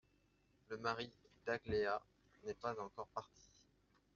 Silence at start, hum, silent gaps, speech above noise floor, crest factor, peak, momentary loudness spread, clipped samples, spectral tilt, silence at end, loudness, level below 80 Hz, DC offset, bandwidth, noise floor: 0.7 s; none; none; 33 dB; 22 dB; -24 dBFS; 13 LU; under 0.1%; -3 dB/octave; 0.9 s; -45 LUFS; -72 dBFS; under 0.1%; 7.2 kHz; -76 dBFS